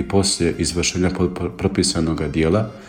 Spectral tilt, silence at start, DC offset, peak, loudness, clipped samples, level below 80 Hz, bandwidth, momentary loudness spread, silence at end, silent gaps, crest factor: -4.5 dB/octave; 0 s; under 0.1%; -4 dBFS; -20 LUFS; under 0.1%; -36 dBFS; 16.5 kHz; 4 LU; 0 s; none; 16 dB